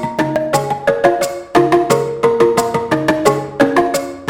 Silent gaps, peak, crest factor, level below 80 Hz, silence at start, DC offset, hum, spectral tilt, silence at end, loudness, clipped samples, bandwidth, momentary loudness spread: none; 0 dBFS; 14 dB; -48 dBFS; 0 s; under 0.1%; none; -5 dB/octave; 0 s; -15 LUFS; under 0.1%; 17 kHz; 5 LU